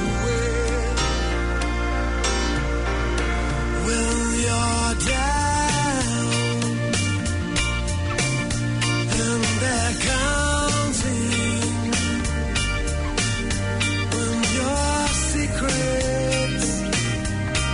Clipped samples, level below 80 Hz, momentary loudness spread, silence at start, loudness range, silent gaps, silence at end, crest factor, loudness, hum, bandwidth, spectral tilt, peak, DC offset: under 0.1%; -28 dBFS; 3 LU; 0 s; 2 LU; none; 0 s; 12 dB; -22 LUFS; none; 11 kHz; -4 dB/octave; -10 dBFS; under 0.1%